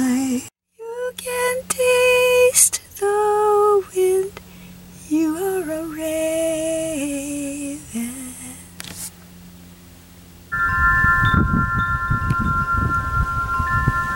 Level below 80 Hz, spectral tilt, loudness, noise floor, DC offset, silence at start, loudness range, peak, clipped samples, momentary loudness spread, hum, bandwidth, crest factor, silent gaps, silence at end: -34 dBFS; -4 dB/octave; -19 LUFS; -44 dBFS; under 0.1%; 0 s; 11 LU; 0 dBFS; under 0.1%; 17 LU; none; 17 kHz; 20 dB; none; 0 s